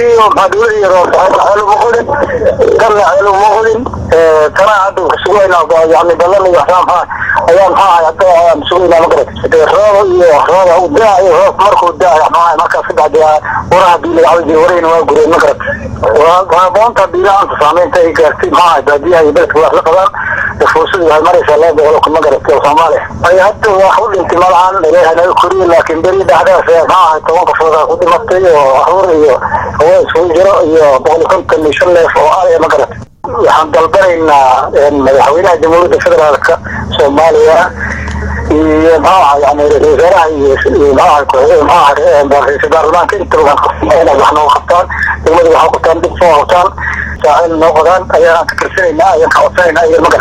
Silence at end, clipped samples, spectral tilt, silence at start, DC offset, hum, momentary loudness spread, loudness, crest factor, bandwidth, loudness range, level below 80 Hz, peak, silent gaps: 0 s; 3%; -5 dB/octave; 0 s; under 0.1%; none; 4 LU; -7 LUFS; 6 dB; 14.5 kHz; 1 LU; -30 dBFS; 0 dBFS; none